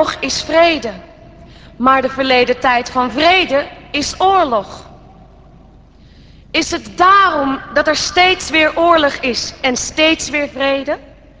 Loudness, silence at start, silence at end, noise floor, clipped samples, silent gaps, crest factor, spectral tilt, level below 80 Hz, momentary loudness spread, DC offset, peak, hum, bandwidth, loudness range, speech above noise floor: -13 LUFS; 0 s; 0.35 s; -43 dBFS; under 0.1%; none; 16 dB; -2.5 dB/octave; -42 dBFS; 9 LU; under 0.1%; 0 dBFS; none; 8 kHz; 4 LU; 29 dB